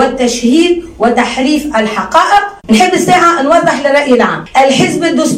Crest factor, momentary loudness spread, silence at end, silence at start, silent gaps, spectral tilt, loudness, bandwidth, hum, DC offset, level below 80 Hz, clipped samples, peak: 10 dB; 5 LU; 0 s; 0 s; none; -4 dB/octave; -9 LUFS; 16 kHz; none; under 0.1%; -40 dBFS; 0.2%; 0 dBFS